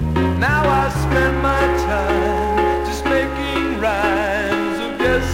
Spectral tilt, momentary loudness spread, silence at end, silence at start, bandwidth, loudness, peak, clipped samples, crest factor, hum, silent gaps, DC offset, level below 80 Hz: -6 dB/octave; 4 LU; 0 s; 0 s; 16 kHz; -18 LUFS; -4 dBFS; under 0.1%; 14 dB; none; none; under 0.1%; -28 dBFS